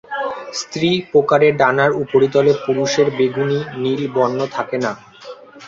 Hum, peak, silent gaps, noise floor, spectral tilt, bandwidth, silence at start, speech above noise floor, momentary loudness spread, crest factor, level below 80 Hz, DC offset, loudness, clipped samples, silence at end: none; -2 dBFS; none; -37 dBFS; -5 dB/octave; 7.8 kHz; 0.1 s; 21 dB; 11 LU; 16 dB; -58 dBFS; under 0.1%; -17 LUFS; under 0.1%; 0 s